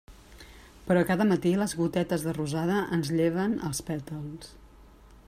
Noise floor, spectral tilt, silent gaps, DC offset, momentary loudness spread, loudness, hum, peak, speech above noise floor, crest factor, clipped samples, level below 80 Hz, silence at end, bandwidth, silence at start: -53 dBFS; -6 dB/octave; none; under 0.1%; 14 LU; -28 LUFS; none; -10 dBFS; 25 dB; 18 dB; under 0.1%; -54 dBFS; 0.15 s; 15.5 kHz; 0.1 s